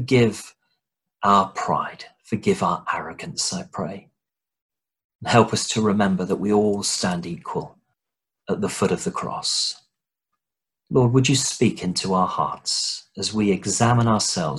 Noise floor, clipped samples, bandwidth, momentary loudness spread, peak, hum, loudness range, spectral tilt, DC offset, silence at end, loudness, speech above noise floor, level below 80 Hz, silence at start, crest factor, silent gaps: -88 dBFS; under 0.1%; 12.5 kHz; 13 LU; -2 dBFS; none; 5 LU; -4.5 dB/octave; under 0.1%; 0 s; -22 LUFS; 67 dB; -54 dBFS; 0 s; 20 dB; 4.62-4.69 s, 5.04-5.19 s